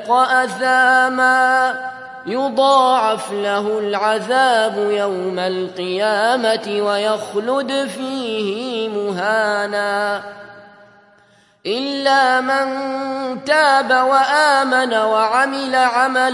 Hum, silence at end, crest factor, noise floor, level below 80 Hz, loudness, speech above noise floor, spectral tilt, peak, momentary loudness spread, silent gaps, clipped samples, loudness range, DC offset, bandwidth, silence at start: none; 0 s; 16 dB; -53 dBFS; -72 dBFS; -16 LUFS; 36 dB; -3 dB/octave; -2 dBFS; 10 LU; none; under 0.1%; 6 LU; under 0.1%; 11.5 kHz; 0 s